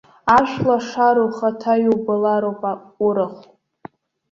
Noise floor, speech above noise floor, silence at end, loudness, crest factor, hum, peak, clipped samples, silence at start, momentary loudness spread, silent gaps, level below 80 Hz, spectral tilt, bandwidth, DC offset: -43 dBFS; 25 dB; 0.95 s; -18 LUFS; 18 dB; none; -2 dBFS; under 0.1%; 0.25 s; 8 LU; none; -54 dBFS; -6.5 dB/octave; 7.6 kHz; under 0.1%